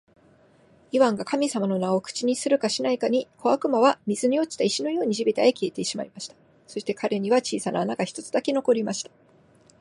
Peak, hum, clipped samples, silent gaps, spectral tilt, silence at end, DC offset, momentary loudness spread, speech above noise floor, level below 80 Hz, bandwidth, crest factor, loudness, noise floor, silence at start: -6 dBFS; none; under 0.1%; none; -4.5 dB/octave; 0.8 s; under 0.1%; 10 LU; 33 dB; -72 dBFS; 11.5 kHz; 20 dB; -24 LUFS; -57 dBFS; 0.95 s